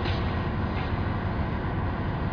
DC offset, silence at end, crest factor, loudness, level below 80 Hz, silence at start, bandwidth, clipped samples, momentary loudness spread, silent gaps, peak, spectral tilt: under 0.1%; 0 s; 12 dB; -29 LUFS; -34 dBFS; 0 s; 5.4 kHz; under 0.1%; 1 LU; none; -16 dBFS; -8.5 dB/octave